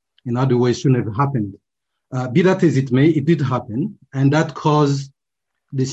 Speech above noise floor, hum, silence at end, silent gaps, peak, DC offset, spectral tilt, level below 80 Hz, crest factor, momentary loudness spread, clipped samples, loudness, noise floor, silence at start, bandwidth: 63 dB; none; 0 s; none; -4 dBFS; under 0.1%; -7.5 dB/octave; -54 dBFS; 14 dB; 11 LU; under 0.1%; -18 LUFS; -80 dBFS; 0.25 s; 8 kHz